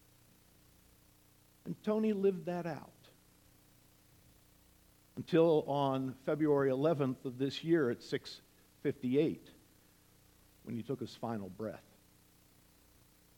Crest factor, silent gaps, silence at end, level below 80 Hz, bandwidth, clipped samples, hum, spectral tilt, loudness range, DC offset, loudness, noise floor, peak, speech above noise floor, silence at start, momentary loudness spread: 20 dB; none; 1.6 s; -72 dBFS; 19 kHz; under 0.1%; none; -7.5 dB/octave; 13 LU; under 0.1%; -35 LUFS; -66 dBFS; -16 dBFS; 32 dB; 1.65 s; 18 LU